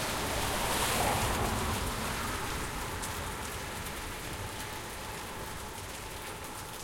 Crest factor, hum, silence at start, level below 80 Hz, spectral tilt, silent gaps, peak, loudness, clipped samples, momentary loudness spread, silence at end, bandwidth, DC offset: 18 dB; none; 0 s; -44 dBFS; -3 dB/octave; none; -16 dBFS; -34 LUFS; under 0.1%; 11 LU; 0 s; 17 kHz; under 0.1%